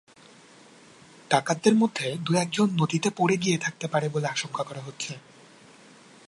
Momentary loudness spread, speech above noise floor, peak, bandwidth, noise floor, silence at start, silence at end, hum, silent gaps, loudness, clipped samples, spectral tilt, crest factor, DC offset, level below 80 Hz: 13 LU; 27 dB; -6 dBFS; 11.5 kHz; -53 dBFS; 1.3 s; 1.1 s; none; none; -26 LUFS; under 0.1%; -5 dB/octave; 22 dB; under 0.1%; -72 dBFS